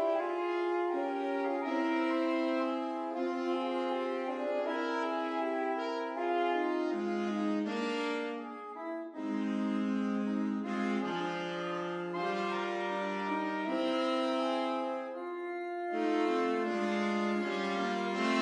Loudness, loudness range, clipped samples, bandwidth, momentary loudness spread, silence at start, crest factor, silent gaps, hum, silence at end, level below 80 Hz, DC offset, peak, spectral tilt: -34 LUFS; 2 LU; under 0.1%; 10 kHz; 6 LU; 0 s; 14 dB; none; none; 0 s; under -90 dBFS; under 0.1%; -18 dBFS; -5.5 dB/octave